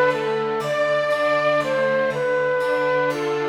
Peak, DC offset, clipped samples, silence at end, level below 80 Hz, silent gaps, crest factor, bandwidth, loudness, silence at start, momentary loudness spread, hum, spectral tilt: -8 dBFS; under 0.1%; under 0.1%; 0 s; -60 dBFS; none; 12 dB; 13.5 kHz; -21 LUFS; 0 s; 3 LU; none; -5 dB/octave